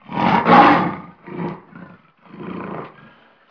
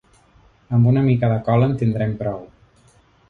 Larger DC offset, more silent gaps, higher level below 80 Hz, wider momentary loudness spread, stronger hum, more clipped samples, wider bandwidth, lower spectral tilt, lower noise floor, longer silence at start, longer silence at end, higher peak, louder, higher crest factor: neither; neither; second, -54 dBFS vs -48 dBFS; first, 24 LU vs 11 LU; neither; neither; first, 5.4 kHz vs 4.4 kHz; second, -7.5 dB/octave vs -10.5 dB/octave; second, -49 dBFS vs -54 dBFS; second, 0.1 s vs 0.7 s; second, 0.65 s vs 0.85 s; first, 0 dBFS vs -4 dBFS; first, -13 LUFS vs -19 LUFS; about the same, 18 dB vs 16 dB